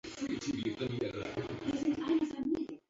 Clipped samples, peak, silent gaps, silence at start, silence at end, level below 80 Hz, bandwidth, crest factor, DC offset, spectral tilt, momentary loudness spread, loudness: under 0.1%; -22 dBFS; none; 0.05 s; 0.1 s; -62 dBFS; 7.8 kHz; 14 dB; under 0.1%; -5.5 dB/octave; 6 LU; -36 LUFS